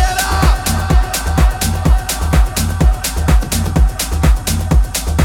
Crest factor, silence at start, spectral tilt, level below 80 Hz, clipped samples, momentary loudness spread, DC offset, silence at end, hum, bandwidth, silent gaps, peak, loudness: 12 dB; 0 s; -4.5 dB/octave; -14 dBFS; under 0.1%; 3 LU; under 0.1%; 0 s; none; 18 kHz; none; 0 dBFS; -15 LUFS